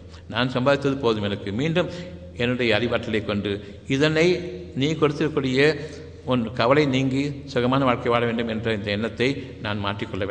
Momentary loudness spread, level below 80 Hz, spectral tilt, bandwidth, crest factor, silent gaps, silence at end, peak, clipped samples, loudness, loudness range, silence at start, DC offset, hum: 10 LU; -50 dBFS; -6 dB/octave; 9.6 kHz; 18 dB; none; 0 s; -4 dBFS; under 0.1%; -23 LUFS; 2 LU; 0 s; under 0.1%; none